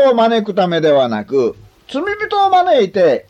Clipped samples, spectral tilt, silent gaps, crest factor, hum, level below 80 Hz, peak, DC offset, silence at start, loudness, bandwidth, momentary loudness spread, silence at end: under 0.1%; -6 dB/octave; none; 12 dB; none; -56 dBFS; -2 dBFS; under 0.1%; 0 s; -14 LUFS; 8.8 kHz; 9 LU; 0.1 s